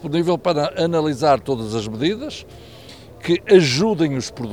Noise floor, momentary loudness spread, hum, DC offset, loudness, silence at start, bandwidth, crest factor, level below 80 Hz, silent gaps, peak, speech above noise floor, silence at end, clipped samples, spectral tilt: -41 dBFS; 13 LU; none; 0.2%; -19 LUFS; 0 s; 14.5 kHz; 18 dB; -50 dBFS; none; -2 dBFS; 22 dB; 0 s; under 0.1%; -5.5 dB/octave